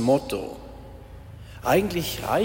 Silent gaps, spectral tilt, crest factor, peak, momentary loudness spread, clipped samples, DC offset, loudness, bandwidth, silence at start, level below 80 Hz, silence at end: none; -5 dB/octave; 18 dB; -8 dBFS; 22 LU; under 0.1%; under 0.1%; -25 LUFS; 16.5 kHz; 0 s; -46 dBFS; 0 s